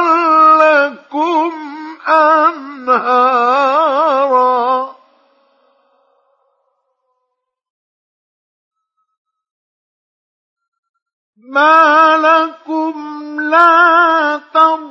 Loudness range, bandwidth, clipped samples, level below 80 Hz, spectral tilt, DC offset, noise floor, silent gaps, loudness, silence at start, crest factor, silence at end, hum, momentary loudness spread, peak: 8 LU; 7.2 kHz; under 0.1%; -78 dBFS; -3 dB/octave; under 0.1%; -73 dBFS; 7.70-8.71 s, 9.18-9.25 s, 9.51-10.56 s, 10.68-10.72 s, 10.79-10.83 s, 10.89-10.94 s, 11.02-11.06 s, 11.13-11.33 s; -11 LUFS; 0 s; 14 dB; 0 s; none; 14 LU; 0 dBFS